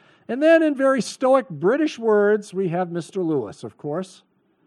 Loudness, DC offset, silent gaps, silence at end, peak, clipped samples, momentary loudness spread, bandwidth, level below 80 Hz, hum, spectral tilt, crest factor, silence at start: -21 LUFS; under 0.1%; none; 0.6 s; -4 dBFS; under 0.1%; 14 LU; 12 kHz; -78 dBFS; none; -6 dB/octave; 18 dB; 0.3 s